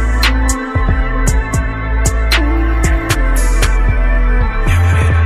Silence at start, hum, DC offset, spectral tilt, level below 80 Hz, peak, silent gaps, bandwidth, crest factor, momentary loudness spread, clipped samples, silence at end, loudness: 0 s; none; under 0.1%; -4.5 dB/octave; -14 dBFS; 0 dBFS; none; 14.5 kHz; 12 dB; 4 LU; under 0.1%; 0 s; -14 LUFS